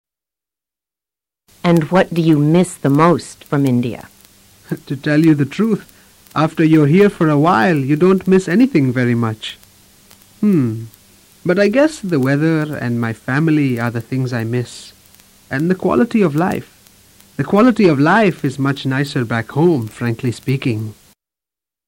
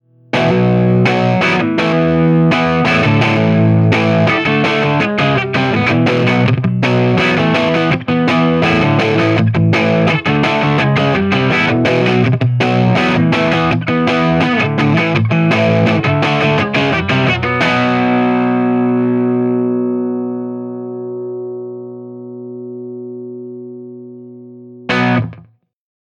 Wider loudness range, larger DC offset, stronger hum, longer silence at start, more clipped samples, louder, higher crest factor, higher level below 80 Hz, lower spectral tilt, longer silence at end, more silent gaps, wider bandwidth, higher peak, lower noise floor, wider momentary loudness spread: second, 5 LU vs 11 LU; neither; second, none vs 60 Hz at -40 dBFS; first, 1.65 s vs 0.35 s; neither; about the same, -15 LUFS vs -13 LUFS; about the same, 14 dB vs 14 dB; second, -52 dBFS vs -44 dBFS; about the same, -7.5 dB/octave vs -7 dB/octave; first, 0.95 s vs 0.8 s; neither; first, 16.5 kHz vs 9.2 kHz; about the same, -2 dBFS vs 0 dBFS; first, -89 dBFS vs -40 dBFS; second, 12 LU vs 16 LU